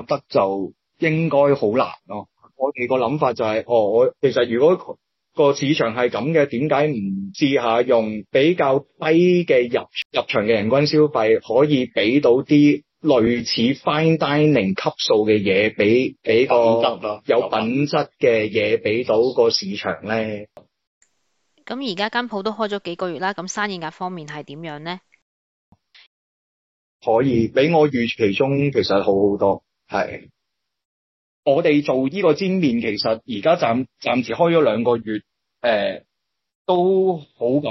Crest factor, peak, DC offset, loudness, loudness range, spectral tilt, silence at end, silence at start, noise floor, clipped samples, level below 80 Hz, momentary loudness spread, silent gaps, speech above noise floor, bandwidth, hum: 14 dB; -4 dBFS; under 0.1%; -19 LUFS; 8 LU; -6 dB/octave; 0 s; 0 s; -79 dBFS; under 0.1%; -60 dBFS; 11 LU; 10.05-10.10 s, 20.87-21.01 s, 25.22-25.72 s, 26.07-27.00 s, 30.85-31.43 s, 36.55-36.65 s; 61 dB; 7.8 kHz; none